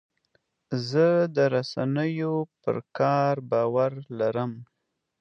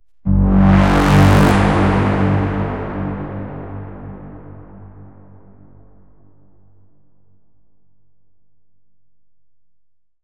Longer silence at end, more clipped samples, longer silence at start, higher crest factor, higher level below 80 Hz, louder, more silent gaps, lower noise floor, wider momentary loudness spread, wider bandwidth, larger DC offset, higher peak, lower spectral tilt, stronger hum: second, 0.55 s vs 5.2 s; neither; first, 0.7 s vs 0.25 s; about the same, 16 dB vs 18 dB; second, -72 dBFS vs -28 dBFS; second, -26 LUFS vs -14 LUFS; neither; about the same, -71 dBFS vs -73 dBFS; second, 9 LU vs 23 LU; second, 7.6 kHz vs 16 kHz; second, under 0.1% vs 0.6%; second, -10 dBFS vs 0 dBFS; about the same, -7.5 dB/octave vs -7.5 dB/octave; neither